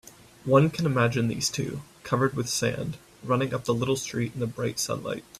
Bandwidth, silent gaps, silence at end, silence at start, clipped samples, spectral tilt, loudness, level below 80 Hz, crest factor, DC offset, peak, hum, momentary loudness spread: 15 kHz; none; 0 s; 0.05 s; under 0.1%; -5 dB/octave; -27 LUFS; -58 dBFS; 20 dB; under 0.1%; -8 dBFS; none; 12 LU